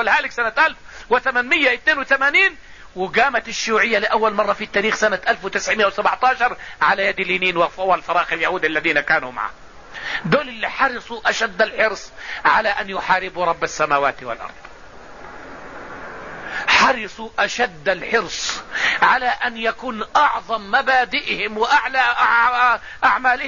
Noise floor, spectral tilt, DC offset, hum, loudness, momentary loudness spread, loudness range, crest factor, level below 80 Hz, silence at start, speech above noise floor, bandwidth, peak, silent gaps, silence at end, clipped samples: -40 dBFS; -2.5 dB/octave; 0.6%; none; -18 LUFS; 14 LU; 4 LU; 16 dB; -50 dBFS; 0 s; 22 dB; 7.4 kHz; -2 dBFS; none; 0 s; under 0.1%